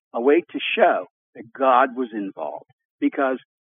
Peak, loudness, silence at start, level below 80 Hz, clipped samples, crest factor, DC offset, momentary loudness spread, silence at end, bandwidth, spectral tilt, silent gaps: -4 dBFS; -21 LUFS; 0.15 s; under -90 dBFS; under 0.1%; 18 dB; under 0.1%; 15 LU; 0.3 s; 3.8 kHz; -1.5 dB/octave; 1.10-1.33 s, 2.73-2.78 s, 2.85-2.98 s